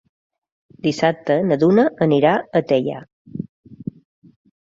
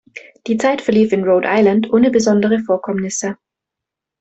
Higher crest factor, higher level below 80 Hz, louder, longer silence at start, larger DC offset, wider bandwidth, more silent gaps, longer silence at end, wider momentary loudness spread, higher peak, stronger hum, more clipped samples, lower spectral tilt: about the same, 18 dB vs 14 dB; about the same, -60 dBFS vs -56 dBFS; second, -18 LUFS vs -15 LUFS; first, 0.85 s vs 0.15 s; neither; about the same, 7.8 kHz vs 8.2 kHz; first, 3.13-3.25 s, 3.49-3.63 s vs none; about the same, 0.9 s vs 0.85 s; first, 19 LU vs 9 LU; about the same, -2 dBFS vs -2 dBFS; neither; neither; first, -7 dB/octave vs -5.5 dB/octave